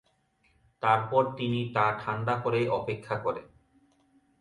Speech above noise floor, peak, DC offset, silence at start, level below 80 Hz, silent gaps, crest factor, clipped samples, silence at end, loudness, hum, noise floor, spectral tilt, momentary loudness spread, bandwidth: 41 dB; -10 dBFS; under 0.1%; 0.8 s; -64 dBFS; none; 20 dB; under 0.1%; 0.95 s; -29 LUFS; none; -69 dBFS; -7.5 dB/octave; 7 LU; 10.5 kHz